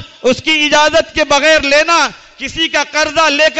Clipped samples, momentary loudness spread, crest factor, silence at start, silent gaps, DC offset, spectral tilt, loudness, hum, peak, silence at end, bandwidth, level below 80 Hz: under 0.1%; 7 LU; 10 dB; 0 s; none; under 0.1%; -1.5 dB/octave; -11 LUFS; none; -2 dBFS; 0 s; 8.4 kHz; -40 dBFS